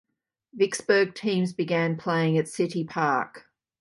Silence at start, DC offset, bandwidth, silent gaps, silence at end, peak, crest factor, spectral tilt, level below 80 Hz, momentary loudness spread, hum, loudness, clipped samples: 0.55 s; under 0.1%; 11.5 kHz; none; 0.4 s; -8 dBFS; 18 dB; -5.5 dB/octave; -72 dBFS; 5 LU; none; -25 LUFS; under 0.1%